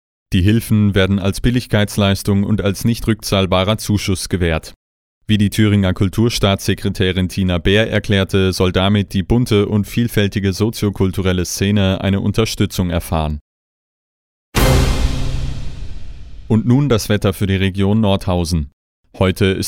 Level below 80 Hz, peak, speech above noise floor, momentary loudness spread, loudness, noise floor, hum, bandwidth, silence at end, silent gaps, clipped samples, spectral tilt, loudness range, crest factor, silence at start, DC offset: -28 dBFS; -2 dBFS; over 75 dB; 6 LU; -16 LUFS; under -90 dBFS; none; 17 kHz; 0 s; 4.76-5.21 s, 13.41-14.52 s, 18.73-19.04 s; under 0.1%; -6 dB/octave; 3 LU; 14 dB; 0.3 s; under 0.1%